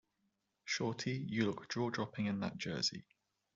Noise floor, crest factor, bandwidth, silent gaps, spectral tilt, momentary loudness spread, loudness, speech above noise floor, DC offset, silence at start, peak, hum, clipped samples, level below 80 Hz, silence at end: -83 dBFS; 20 dB; 7.8 kHz; none; -4 dB/octave; 4 LU; -39 LUFS; 44 dB; under 0.1%; 0.65 s; -22 dBFS; none; under 0.1%; -76 dBFS; 0.55 s